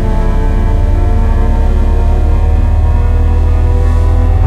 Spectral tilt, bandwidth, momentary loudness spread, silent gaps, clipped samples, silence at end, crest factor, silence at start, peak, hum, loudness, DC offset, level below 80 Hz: -8.5 dB/octave; 4.6 kHz; 2 LU; none; under 0.1%; 0 s; 8 dB; 0 s; 0 dBFS; none; -12 LUFS; under 0.1%; -10 dBFS